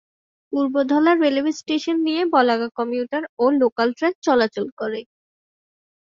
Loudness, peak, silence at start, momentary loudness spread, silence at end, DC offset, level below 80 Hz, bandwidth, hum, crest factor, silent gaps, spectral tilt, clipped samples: -20 LUFS; -4 dBFS; 0.5 s; 10 LU; 1 s; under 0.1%; -66 dBFS; 7.6 kHz; none; 18 dB; 3.29-3.37 s, 3.72-3.76 s, 4.15-4.22 s, 4.72-4.77 s; -4.5 dB/octave; under 0.1%